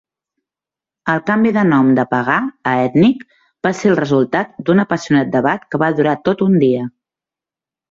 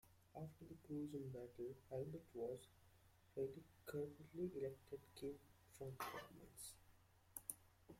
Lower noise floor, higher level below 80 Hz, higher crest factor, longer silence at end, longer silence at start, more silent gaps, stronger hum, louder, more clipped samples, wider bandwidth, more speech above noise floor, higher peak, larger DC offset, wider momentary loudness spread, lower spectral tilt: first, -89 dBFS vs -73 dBFS; first, -56 dBFS vs -78 dBFS; second, 14 dB vs 28 dB; first, 1 s vs 0 s; first, 1.05 s vs 0.05 s; neither; neither; first, -15 LUFS vs -53 LUFS; neither; second, 7.6 kHz vs 16.5 kHz; first, 74 dB vs 21 dB; first, -2 dBFS vs -26 dBFS; neither; second, 7 LU vs 11 LU; first, -7 dB/octave vs -5.5 dB/octave